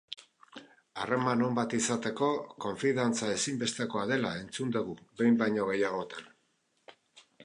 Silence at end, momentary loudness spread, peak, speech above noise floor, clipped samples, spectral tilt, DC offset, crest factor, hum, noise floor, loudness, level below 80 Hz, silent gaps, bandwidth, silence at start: 0 s; 18 LU; -14 dBFS; 44 dB; under 0.1%; -4.5 dB/octave; under 0.1%; 18 dB; none; -74 dBFS; -31 LUFS; -70 dBFS; none; 11 kHz; 0.1 s